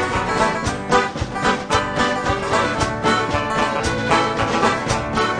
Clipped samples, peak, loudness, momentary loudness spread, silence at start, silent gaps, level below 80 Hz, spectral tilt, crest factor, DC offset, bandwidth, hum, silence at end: under 0.1%; -2 dBFS; -19 LUFS; 3 LU; 0 s; none; -36 dBFS; -4.5 dB/octave; 18 dB; under 0.1%; 10.5 kHz; none; 0 s